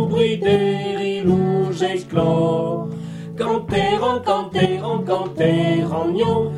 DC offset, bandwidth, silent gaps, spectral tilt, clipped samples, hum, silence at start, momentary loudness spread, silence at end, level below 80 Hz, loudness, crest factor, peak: under 0.1%; 11.5 kHz; none; -7 dB/octave; under 0.1%; none; 0 s; 5 LU; 0 s; -50 dBFS; -19 LUFS; 16 dB; -2 dBFS